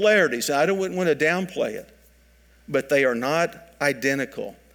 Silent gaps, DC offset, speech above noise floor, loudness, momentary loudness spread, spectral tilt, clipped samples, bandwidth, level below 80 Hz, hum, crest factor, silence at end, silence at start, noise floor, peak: none; under 0.1%; 33 dB; -23 LUFS; 8 LU; -4 dB/octave; under 0.1%; 19 kHz; -60 dBFS; none; 16 dB; 0.2 s; 0 s; -56 dBFS; -6 dBFS